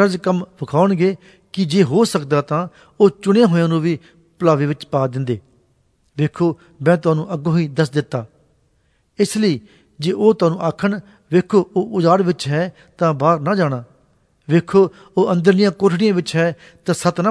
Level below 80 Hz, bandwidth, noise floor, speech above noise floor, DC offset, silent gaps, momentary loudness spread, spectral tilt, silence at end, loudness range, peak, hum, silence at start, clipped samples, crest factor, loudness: -58 dBFS; 11 kHz; -61 dBFS; 45 dB; under 0.1%; none; 9 LU; -7 dB/octave; 0 s; 3 LU; 0 dBFS; none; 0 s; under 0.1%; 16 dB; -17 LUFS